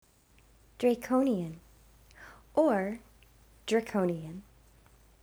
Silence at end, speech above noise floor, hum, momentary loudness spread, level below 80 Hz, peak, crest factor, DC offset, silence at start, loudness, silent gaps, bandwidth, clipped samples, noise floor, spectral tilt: 0.8 s; 33 dB; none; 23 LU; -62 dBFS; -14 dBFS; 18 dB; under 0.1%; 0.8 s; -30 LUFS; none; over 20 kHz; under 0.1%; -62 dBFS; -6.5 dB/octave